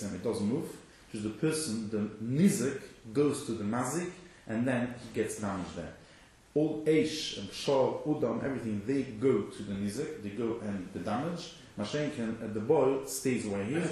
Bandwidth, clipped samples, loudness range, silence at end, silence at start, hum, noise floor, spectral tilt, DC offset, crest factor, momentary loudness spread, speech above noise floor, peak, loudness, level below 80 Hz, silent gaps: 13 kHz; under 0.1%; 3 LU; 0 s; 0 s; none; -58 dBFS; -5.5 dB/octave; under 0.1%; 18 dB; 11 LU; 26 dB; -14 dBFS; -33 LUFS; -62 dBFS; none